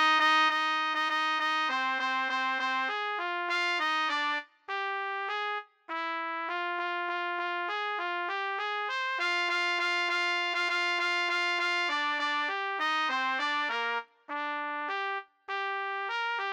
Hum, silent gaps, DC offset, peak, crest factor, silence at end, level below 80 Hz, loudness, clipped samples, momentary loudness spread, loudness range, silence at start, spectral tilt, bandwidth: none; none; under 0.1%; -16 dBFS; 14 dB; 0 s; under -90 dBFS; -29 LUFS; under 0.1%; 6 LU; 5 LU; 0 s; 1 dB/octave; 18.5 kHz